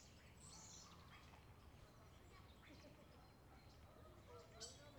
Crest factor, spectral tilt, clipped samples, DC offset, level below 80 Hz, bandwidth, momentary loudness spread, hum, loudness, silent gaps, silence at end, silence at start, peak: 20 dB; -3.5 dB/octave; under 0.1%; under 0.1%; -70 dBFS; over 20 kHz; 8 LU; none; -63 LUFS; none; 0 s; 0 s; -42 dBFS